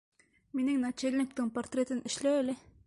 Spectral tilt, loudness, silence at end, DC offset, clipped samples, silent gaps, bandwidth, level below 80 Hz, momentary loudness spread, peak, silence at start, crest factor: -4 dB/octave; -33 LUFS; 0.3 s; under 0.1%; under 0.1%; none; 11.5 kHz; -68 dBFS; 5 LU; -20 dBFS; 0.55 s; 14 dB